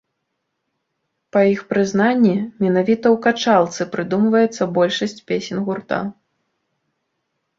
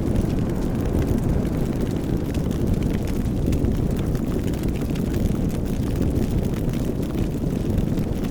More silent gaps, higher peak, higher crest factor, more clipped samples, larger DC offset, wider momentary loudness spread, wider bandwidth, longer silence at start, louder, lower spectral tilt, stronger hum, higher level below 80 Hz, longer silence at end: neither; first, -2 dBFS vs -8 dBFS; about the same, 18 dB vs 14 dB; neither; second, under 0.1% vs 0.6%; first, 9 LU vs 2 LU; second, 7.6 kHz vs over 20 kHz; first, 1.35 s vs 0 s; first, -18 LUFS vs -24 LUFS; second, -6 dB/octave vs -8 dB/octave; neither; second, -62 dBFS vs -28 dBFS; first, 1.45 s vs 0 s